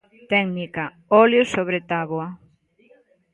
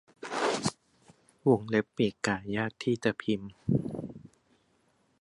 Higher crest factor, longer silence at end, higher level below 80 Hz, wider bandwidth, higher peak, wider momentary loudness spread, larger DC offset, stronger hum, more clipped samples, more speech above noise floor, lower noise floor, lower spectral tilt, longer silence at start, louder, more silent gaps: about the same, 20 dB vs 20 dB; about the same, 1 s vs 0.95 s; about the same, -62 dBFS vs -62 dBFS; about the same, 11.5 kHz vs 11.5 kHz; first, -2 dBFS vs -12 dBFS; first, 14 LU vs 11 LU; neither; neither; neither; second, 37 dB vs 41 dB; second, -57 dBFS vs -70 dBFS; about the same, -6 dB/octave vs -5.5 dB/octave; about the same, 0.3 s vs 0.2 s; first, -20 LUFS vs -31 LUFS; neither